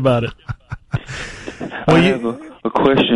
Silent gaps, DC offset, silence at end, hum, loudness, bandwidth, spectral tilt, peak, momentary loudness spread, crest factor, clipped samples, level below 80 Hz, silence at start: none; under 0.1%; 0 s; none; -18 LUFS; 11.5 kHz; -6.5 dB/octave; -2 dBFS; 17 LU; 16 dB; under 0.1%; -40 dBFS; 0 s